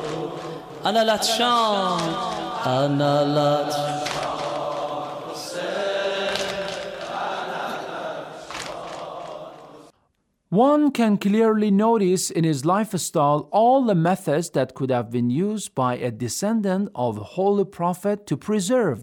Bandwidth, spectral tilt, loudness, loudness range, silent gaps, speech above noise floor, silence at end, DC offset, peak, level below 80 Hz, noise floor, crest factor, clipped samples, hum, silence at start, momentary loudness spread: 19 kHz; -5 dB/octave; -22 LUFS; 8 LU; none; 49 dB; 0 s; under 0.1%; -6 dBFS; -62 dBFS; -69 dBFS; 16 dB; under 0.1%; none; 0 s; 13 LU